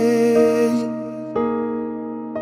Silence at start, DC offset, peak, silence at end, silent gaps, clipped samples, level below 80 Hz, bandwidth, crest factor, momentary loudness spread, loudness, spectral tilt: 0 s; under 0.1%; -4 dBFS; 0 s; none; under 0.1%; -58 dBFS; 15 kHz; 14 dB; 13 LU; -20 LUFS; -6 dB/octave